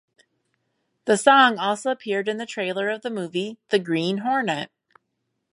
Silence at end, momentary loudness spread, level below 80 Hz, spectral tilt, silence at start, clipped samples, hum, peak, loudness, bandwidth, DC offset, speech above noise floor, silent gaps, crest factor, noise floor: 0.85 s; 13 LU; -78 dBFS; -4 dB/octave; 1.05 s; under 0.1%; none; -2 dBFS; -22 LUFS; 11.5 kHz; under 0.1%; 55 dB; none; 22 dB; -77 dBFS